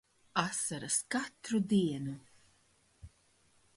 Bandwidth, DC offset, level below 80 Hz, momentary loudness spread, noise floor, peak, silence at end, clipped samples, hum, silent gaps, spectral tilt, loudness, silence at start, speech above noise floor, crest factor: 11.5 kHz; under 0.1%; -68 dBFS; 10 LU; -70 dBFS; -16 dBFS; 0.7 s; under 0.1%; none; none; -4 dB/octave; -34 LUFS; 0.35 s; 36 dB; 22 dB